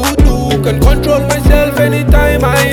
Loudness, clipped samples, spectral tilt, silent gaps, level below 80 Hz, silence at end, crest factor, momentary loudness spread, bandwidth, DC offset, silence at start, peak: -11 LUFS; under 0.1%; -5.5 dB/octave; none; -12 dBFS; 0 s; 8 dB; 2 LU; 18 kHz; under 0.1%; 0 s; 0 dBFS